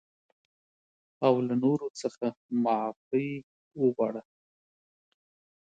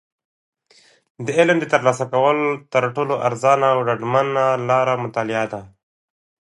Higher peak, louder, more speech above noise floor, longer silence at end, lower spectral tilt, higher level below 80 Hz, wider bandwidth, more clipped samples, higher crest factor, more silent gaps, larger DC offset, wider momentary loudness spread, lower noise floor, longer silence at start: second, -10 dBFS vs 0 dBFS; second, -29 LUFS vs -19 LUFS; first, over 62 dB vs 36 dB; first, 1.4 s vs 0.9 s; first, -7 dB/octave vs -5.5 dB/octave; second, -76 dBFS vs -66 dBFS; second, 9 kHz vs 11.5 kHz; neither; about the same, 22 dB vs 18 dB; first, 1.90-1.94 s, 2.37-2.49 s, 2.96-3.11 s, 3.43-3.71 s vs none; neither; first, 10 LU vs 6 LU; first, under -90 dBFS vs -55 dBFS; about the same, 1.2 s vs 1.2 s